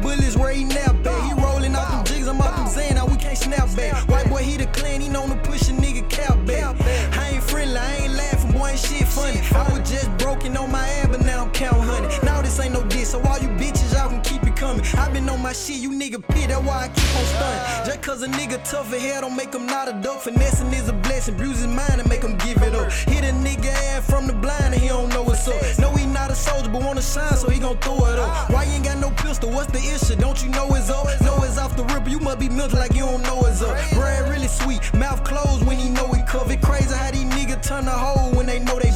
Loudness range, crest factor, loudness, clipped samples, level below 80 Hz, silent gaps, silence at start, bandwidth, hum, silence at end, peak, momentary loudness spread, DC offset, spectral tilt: 2 LU; 12 dB; -21 LUFS; under 0.1%; -22 dBFS; none; 0 s; 16.5 kHz; none; 0 s; -6 dBFS; 4 LU; under 0.1%; -5 dB/octave